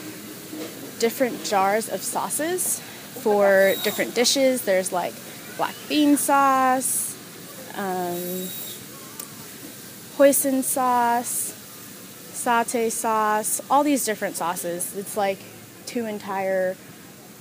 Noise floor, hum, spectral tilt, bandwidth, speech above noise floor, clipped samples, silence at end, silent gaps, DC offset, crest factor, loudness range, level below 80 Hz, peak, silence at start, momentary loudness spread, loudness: -44 dBFS; none; -2.5 dB/octave; 16 kHz; 22 dB; under 0.1%; 0 s; none; under 0.1%; 20 dB; 5 LU; -72 dBFS; -4 dBFS; 0 s; 19 LU; -22 LUFS